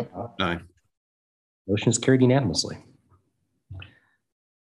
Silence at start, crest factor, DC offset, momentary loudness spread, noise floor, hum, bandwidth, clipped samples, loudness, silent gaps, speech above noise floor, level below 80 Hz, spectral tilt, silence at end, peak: 0 s; 22 dB; under 0.1%; 24 LU; -74 dBFS; none; 11.5 kHz; under 0.1%; -24 LUFS; 0.97-1.65 s; 51 dB; -58 dBFS; -5 dB/octave; 0.9 s; -6 dBFS